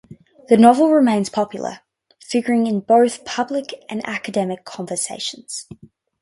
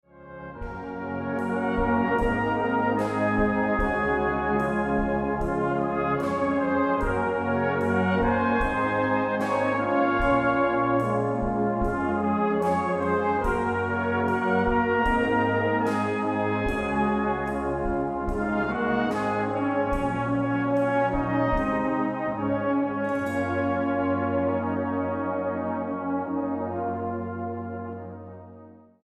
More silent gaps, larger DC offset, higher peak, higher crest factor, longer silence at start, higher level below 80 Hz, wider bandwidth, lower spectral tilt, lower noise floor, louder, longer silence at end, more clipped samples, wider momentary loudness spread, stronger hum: neither; neither; first, 0 dBFS vs -10 dBFS; about the same, 18 dB vs 16 dB; about the same, 0.1 s vs 0.15 s; second, -62 dBFS vs -40 dBFS; about the same, 11.5 kHz vs 12 kHz; second, -4.5 dB/octave vs -7.5 dB/octave; second, -39 dBFS vs -48 dBFS; first, -18 LUFS vs -25 LUFS; first, 0.45 s vs 0.3 s; neither; first, 17 LU vs 6 LU; neither